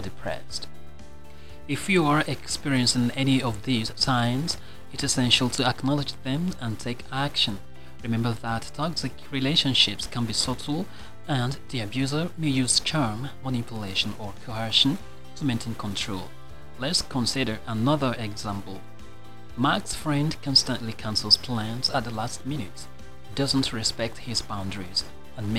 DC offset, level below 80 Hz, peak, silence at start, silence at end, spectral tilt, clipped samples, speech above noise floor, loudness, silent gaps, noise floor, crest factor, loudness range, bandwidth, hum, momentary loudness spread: 2%; -48 dBFS; -4 dBFS; 0 s; 0 s; -4 dB/octave; under 0.1%; 20 dB; -25 LUFS; none; -47 dBFS; 24 dB; 4 LU; 16 kHz; none; 15 LU